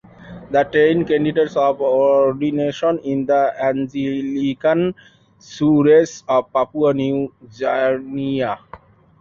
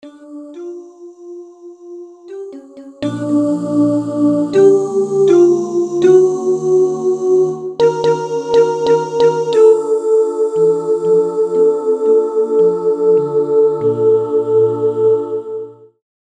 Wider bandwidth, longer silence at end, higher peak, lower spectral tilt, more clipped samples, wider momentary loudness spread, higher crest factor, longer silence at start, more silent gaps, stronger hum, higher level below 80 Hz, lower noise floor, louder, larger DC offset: second, 7.4 kHz vs 9.4 kHz; second, 0.45 s vs 0.65 s; second, -4 dBFS vs 0 dBFS; about the same, -7 dB/octave vs -7 dB/octave; neither; second, 8 LU vs 21 LU; about the same, 14 dB vs 14 dB; first, 0.2 s vs 0.05 s; neither; neither; first, -56 dBFS vs -62 dBFS; first, -43 dBFS vs -35 dBFS; second, -18 LUFS vs -14 LUFS; neither